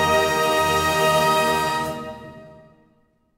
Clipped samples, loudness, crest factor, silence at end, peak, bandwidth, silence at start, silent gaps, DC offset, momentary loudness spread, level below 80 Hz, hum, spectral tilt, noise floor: under 0.1%; -19 LUFS; 16 dB; 0.85 s; -6 dBFS; 16.5 kHz; 0 s; none; under 0.1%; 15 LU; -48 dBFS; none; -3.5 dB/octave; -62 dBFS